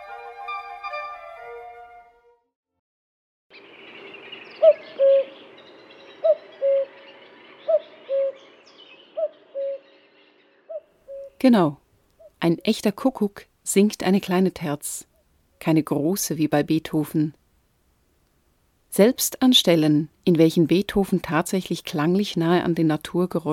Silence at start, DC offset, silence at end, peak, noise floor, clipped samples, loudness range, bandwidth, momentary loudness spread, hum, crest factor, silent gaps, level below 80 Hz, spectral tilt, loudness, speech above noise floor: 0 s; under 0.1%; 0 s; -4 dBFS; -64 dBFS; under 0.1%; 12 LU; 17.5 kHz; 21 LU; none; 20 dB; 2.56-2.63 s, 2.79-3.50 s; -58 dBFS; -5 dB/octave; -22 LUFS; 44 dB